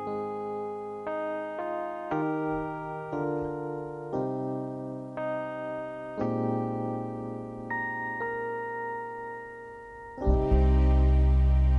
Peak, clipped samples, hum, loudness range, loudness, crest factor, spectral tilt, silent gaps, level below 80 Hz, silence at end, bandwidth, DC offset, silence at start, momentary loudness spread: -12 dBFS; under 0.1%; none; 6 LU; -30 LUFS; 16 dB; -9.5 dB/octave; none; -30 dBFS; 0 s; 3.9 kHz; under 0.1%; 0 s; 14 LU